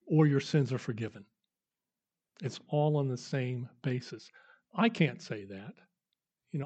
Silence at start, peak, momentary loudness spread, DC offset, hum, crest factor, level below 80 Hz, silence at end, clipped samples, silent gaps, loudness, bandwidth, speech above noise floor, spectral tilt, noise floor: 0.05 s; -12 dBFS; 17 LU; under 0.1%; none; 22 dB; -80 dBFS; 0 s; under 0.1%; none; -33 LUFS; 8.2 kHz; over 58 dB; -7 dB/octave; under -90 dBFS